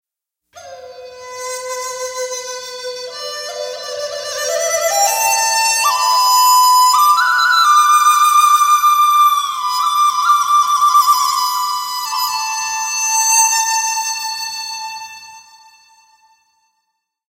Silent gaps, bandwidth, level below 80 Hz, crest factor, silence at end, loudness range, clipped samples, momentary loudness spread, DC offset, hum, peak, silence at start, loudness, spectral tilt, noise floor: none; 16 kHz; -68 dBFS; 14 dB; 1.9 s; 14 LU; under 0.1%; 16 LU; under 0.1%; none; 0 dBFS; 0.55 s; -13 LUFS; 3.5 dB/octave; -78 dBFS